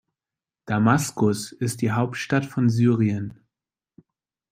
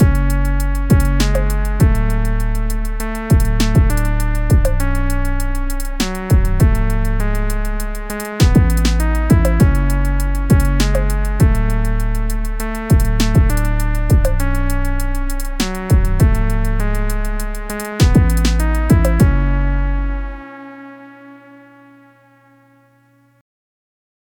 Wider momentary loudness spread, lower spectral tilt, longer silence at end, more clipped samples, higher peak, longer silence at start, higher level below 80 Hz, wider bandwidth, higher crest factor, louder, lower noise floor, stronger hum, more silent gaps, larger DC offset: about the same, 8 LU vs 10 LU; about the same, -6.5 dB/octave vs -6 dB/octave; second, 1.2 s vs 3.05 s; neither; about the same, -4 dBFS vs -2 dBFS; first, 0.65 s vs 0 s; second, -62 dBFS vs -16 dBFS; second, 16 kHz vs 19 kHz; first, 20 dB vs 14 dB; second, -23 LUFS vs -17 LUFS; first, under -90 dBFS vs -53 dBFS; neither; neither; neither